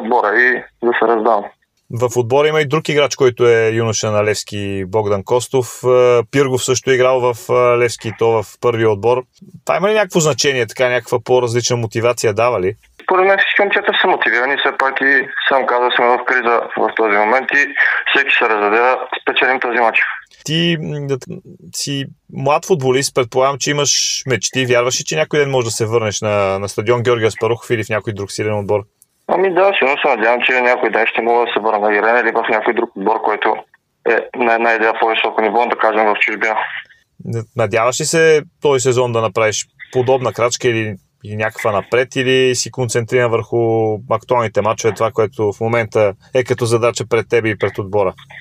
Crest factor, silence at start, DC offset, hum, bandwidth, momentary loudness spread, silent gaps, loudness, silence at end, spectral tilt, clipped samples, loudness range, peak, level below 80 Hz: 16 dB; 0 s; under 0.1%; none; 16 kHz; 8 LU; none; -15 LUFS; 0 s; -4 dB/octave; under 0.1%; 3 LU; 0 dBFS; -56 dBFS